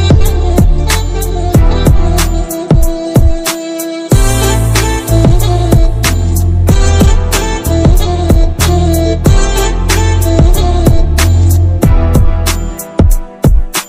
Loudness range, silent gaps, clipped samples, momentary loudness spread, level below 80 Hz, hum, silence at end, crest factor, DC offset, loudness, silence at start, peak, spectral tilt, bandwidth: 2 LU; none; 2%; 4 LU; -12 dBFS; none; 0 s; 8 dB; under 0.1%; -11 LUFS; 0 s; 0 dBFS; -5.5 dB/octave; 16 kHz